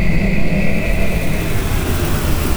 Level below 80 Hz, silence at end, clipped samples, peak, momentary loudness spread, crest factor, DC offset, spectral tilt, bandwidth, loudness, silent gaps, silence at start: -20 dBFS; 0 s; under 0.1%; -2 dBFS; 2 LU; 12 dB; under 0.1%; -5.5 dB/octave; over 20 kHz; -19 LUFS; none; 0 s